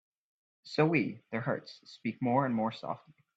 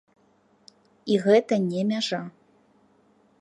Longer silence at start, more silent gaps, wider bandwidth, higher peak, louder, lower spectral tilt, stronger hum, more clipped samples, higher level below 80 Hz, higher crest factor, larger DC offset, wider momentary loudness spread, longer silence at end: second, 0.65 s vs 1.05 s; neither; second, 8 kHz vs 10.5 kHz; second, -14 dBFS vs -6 dBFS; second, -33 LUFS vs -24 LUFS; first, -7.5 dB/octave vs -6 dB/octave; neither; neither; about the same, -74 dBFS vs -76 dBFS; about the same, 20 dB vs 20 dB; neither; second, 13 LU vs 17 LU; second, 0.4 s vs 1.1 s